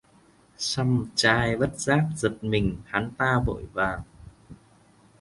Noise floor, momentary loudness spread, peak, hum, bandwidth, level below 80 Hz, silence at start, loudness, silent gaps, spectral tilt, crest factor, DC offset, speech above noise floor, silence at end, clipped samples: -58 dBFS; 8 LU; -6 dBFS; none; 11.5 kHz; -44 dBFS; 0.6 s; -25 LUFS; none; -5 dB/octave; 22 dB; under 0.1%; 33 dB; 0.65 s; under 0.1%